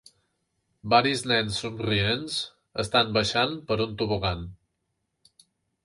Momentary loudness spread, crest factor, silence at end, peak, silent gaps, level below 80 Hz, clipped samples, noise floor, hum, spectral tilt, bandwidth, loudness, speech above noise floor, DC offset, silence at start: 11 LU; 22 dB; 1.3 s; -6 dBFS; none; -50 dBFS; under 0.1%; -78 dBFS; none; -4.5 dB/octave; 11.5 kHz; -25 LUFS; 53 dB; under 0.1%; 0.85 s